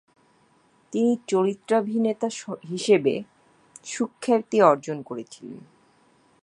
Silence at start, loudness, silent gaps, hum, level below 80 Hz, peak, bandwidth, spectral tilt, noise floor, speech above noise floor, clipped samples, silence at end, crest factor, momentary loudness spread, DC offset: 0.9 s; -24 LUFS; none; none; -76 dBFS; -2 dBFS; 11 kHz; -5.5 dB/octave; -61 dBFS; 38 dB; under 0.1%; 0.85 s; 22 dB; 19 LU; under 0.1%